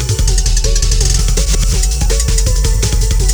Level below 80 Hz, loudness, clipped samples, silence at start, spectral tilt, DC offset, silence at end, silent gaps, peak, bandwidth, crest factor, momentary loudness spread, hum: -12 dBFS; -14 LUFS; under 0.1%; 0 s; -3.5 dB/octave; under 0.1%; 0 s; none; 0 dBFS; over 20 kHz; 10 dB; 1 LU; none